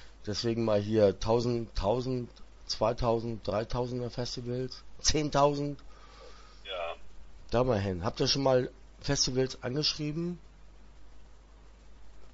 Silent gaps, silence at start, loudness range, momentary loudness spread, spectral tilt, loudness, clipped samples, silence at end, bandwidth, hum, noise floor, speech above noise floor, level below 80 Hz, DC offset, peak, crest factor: none; 0 s; 3 LU; 13 LU; -4.5 dB/octave; -31 LUFS; under 0.1%; 0 s; 8 kHz; none; -53 dBFS; 24 dB; -46 dBFS; under 0.1%; -12 dBFS; 20 dB